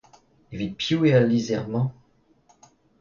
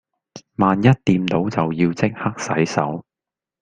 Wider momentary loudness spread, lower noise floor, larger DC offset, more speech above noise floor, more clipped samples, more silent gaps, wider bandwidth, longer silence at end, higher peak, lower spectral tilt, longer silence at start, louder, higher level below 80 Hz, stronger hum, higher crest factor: first, 14 LU vs 10 LU; second, -61 dBFS vs -88 dBFS; neither; second, 39 dB vs 70 dB; neither; neither; second, 7.4 kHz vs 9.4 kHz; first, 1.1 s vs 0.6 s; second, -6 dBFS vs -2 dBFS; about the same, -6.5 dB/octave vs -6.5 dB/octave; first, 0.5 s vs 0.35 s; second, -23 LUFS vs -19 LUFS; second, -58 dBFS vs -52 dBFS; neither; about the same, 18 dB vs 18 dB